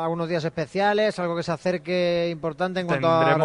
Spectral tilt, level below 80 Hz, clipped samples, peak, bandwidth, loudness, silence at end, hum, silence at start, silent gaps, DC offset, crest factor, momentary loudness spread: -6.5 dB/octave; -60 dBFS; under 0.1%; -6 dBFS; 10.5 kHz; -24 LUFS; 0 s; none; 0 s; none; under 0.1%; 16 dB; 7 LU